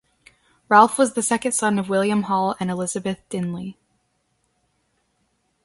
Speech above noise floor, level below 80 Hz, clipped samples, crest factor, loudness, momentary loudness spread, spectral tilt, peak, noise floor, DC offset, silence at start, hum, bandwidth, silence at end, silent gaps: 49 dB; -62 dBFS; under 0.1%; 22 dB; -20 LUFS; 13 LU; -4.5 dB/octave; 0 dBFS; -69 dBFS; under 0.1%; 0.7 s; none; 12 kHz; 1.95 s; none